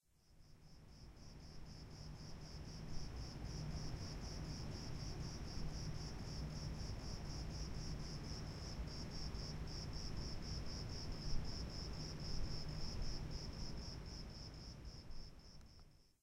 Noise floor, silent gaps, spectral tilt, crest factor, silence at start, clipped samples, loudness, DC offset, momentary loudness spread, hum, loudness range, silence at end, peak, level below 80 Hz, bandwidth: -67 dBFS; none; -5 dB/octave; 20 dB; 0.3 s; under 0.1%; -49 LUFS; under 0.1%; 12 LU; none; 4 LU; 0.1 s; -28 dBFS; -50 dBFS; 15 kHz